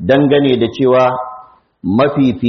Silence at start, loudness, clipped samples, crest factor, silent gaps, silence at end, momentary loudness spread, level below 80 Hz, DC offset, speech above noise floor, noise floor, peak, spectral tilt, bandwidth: 0 s; -13 LUFS; under 0.1%; 12 dB; none; 0 s; 13 LU; -48 dBFS; under 0.1%; 26 dB; -38 dBFS; 0 dBFS; -5.5 dB/octave; 6.2 kHz